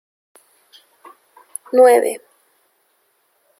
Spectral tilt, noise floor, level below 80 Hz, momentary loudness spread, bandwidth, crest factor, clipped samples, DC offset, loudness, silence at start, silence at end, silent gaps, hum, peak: -2 dB/octave; -64 dBFS; -78 dBFS; 23 LU; 14.5 kHz; 20 dB; under 0.1%; under 0.1%; -14 LUFS; 1.75 s; 1.4 s; none; none; -2 dBFS